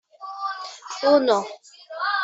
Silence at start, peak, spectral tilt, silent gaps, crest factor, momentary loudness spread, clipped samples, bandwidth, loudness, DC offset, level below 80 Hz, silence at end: 0.2 s; -4 dBFS; -3 dB/octave; none; 20 dB; 20 LU; under 0.1%; 8 kHz; -22 LUFS; under 0.1%; -74 dBFS; 0 s